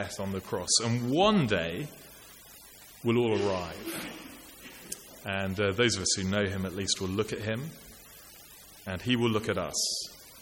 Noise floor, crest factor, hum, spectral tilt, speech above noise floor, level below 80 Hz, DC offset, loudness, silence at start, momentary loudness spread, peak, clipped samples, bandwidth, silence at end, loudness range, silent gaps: -51 dBFS; 20 dB; none; -4 dB/octave; 22 dB; -58 dBFS; under 0.1%; -29 LUFS; 0 s; 23 LU; -12 dBFS; under 0.1%; 17 kHz; 0 s; 5 LU; none